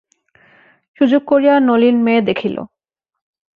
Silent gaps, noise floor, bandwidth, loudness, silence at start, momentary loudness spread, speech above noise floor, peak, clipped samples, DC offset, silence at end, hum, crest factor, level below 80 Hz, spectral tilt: none; -80 dBFS; 5 kHz; -14 LUFS; 1 s; 10 LU; 68 dB; -2 dBFS; under 0.1%; under 0.1%; 0.9 s; none; 14 dB; -60 dBFS; -8 dB/octave